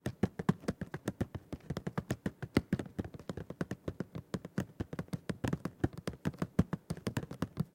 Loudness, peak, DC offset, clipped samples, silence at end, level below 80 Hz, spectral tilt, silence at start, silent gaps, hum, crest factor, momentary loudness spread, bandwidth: -39 LUFS; -14 dBFS; under 0.1%; under 0.1%; 0.1 s; -56 dBFS; -7 dB/octave; 0.05 s; none; none; 24 dB; 9 LU; 16.5 kHz